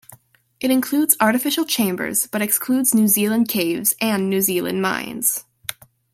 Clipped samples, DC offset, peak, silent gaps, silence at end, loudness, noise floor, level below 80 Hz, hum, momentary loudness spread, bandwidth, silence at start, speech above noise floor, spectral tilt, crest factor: under 0.1%; under 0.1%; 0 dBFS; none; 0.4 s; -19 LUFS; -51 dBFS; -64 dBFS; none; 7 LU; 16.5 kHz; 0.1 s; 32 dB; -3 dB/octave; 20 dB